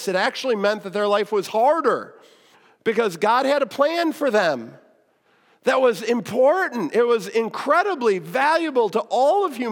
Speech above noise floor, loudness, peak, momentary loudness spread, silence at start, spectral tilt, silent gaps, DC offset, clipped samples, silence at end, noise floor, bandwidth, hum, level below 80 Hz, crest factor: 41 dB; -21 LUFS; -6 dBFS; 5 LU; 0 s; -4.5 dB/octave; none; under 0.1%; under 0.1%; 0 s; -61 dBFS; 17.5 kHz; none; -80 dBFS; 16 dB